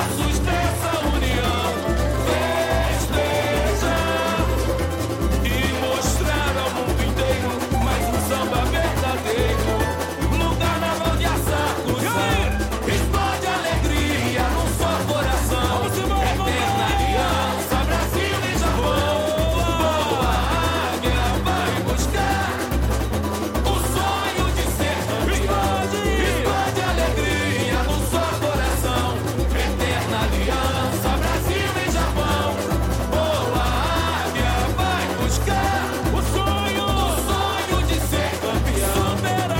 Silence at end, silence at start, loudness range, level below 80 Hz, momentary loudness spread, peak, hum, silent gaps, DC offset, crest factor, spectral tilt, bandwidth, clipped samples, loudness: 0 s; 0 s; 1 LU; -26 dBFS; 2 LU; -8 dBFS; none; none; under 0.1%; 12 dB; -4.5 dB/octave; 16.5 kHz; under 0.1%; -21 LUFS